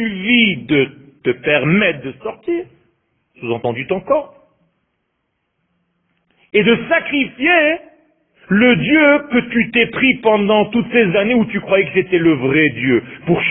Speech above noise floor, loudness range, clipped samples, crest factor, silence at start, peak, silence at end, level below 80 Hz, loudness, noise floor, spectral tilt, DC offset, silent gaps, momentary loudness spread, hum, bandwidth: 55 dB; 10 LU; under 0.1%; 16 dB; 0 s; 0 dBFS; 0 s; -50 dBFS; -15 LUFS; -70 dBFS; -11 dB/octave; under 0.1%; none; 10 LU; none; 3.9 kHz